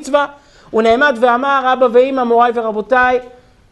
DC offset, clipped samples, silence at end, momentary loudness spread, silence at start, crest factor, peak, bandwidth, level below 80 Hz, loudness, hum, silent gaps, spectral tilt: under 0.1%; under 0.1%; 0.45 s; 8 LU; 0 s; 12 dB; 0 dBFS; 11 kHz; -48 dBFS; -13 LUFS; none; none; -4.5 dB/octave